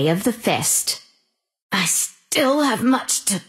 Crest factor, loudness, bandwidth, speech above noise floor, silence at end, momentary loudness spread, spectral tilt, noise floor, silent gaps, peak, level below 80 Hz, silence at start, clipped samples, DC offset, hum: 16 dB; -19 LUFS; 16 kHz; 48 dB; 0.05 s; 5 LU; -3 dB/octave; -68 dBFS; 1.62-1.70 s; -6 dBFS; -64 dBFS; 0 s; under 0.1%; under 0.1%; none